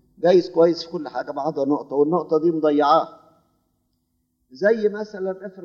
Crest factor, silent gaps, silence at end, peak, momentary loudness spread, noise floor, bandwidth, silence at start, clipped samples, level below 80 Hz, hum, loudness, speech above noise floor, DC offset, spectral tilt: 18 dB; none; 0 s; -4 dBFS; 12 LU; -71 dBFS; 7 kHz; 0.2 s; under 0.1%; -70 dBFS; none; -21 LUFS; 51 dB; under 0.1%; -7 dB/octave